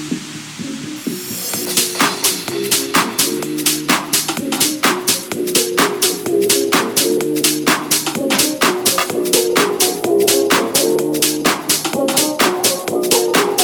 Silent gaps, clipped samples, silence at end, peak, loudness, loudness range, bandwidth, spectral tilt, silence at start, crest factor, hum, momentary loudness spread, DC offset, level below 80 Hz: none; under 0.1%; 0 s; 0 dBFS; -15 LUFS; 2 LU; over 20 kHz; -2 dB/octave; 0 s; 16 dB; none; 7 LU; under 0.1%; -56 dBFS